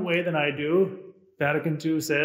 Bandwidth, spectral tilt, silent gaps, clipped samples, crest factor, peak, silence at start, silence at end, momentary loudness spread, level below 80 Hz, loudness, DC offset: 16 kHz; -5.5 dB/octave; none; under 0.1%; 16 dB; -10 dBFS; 0 s; 0 s; 5 LU; -74 dBFS; -26 LUFS; under 0.1%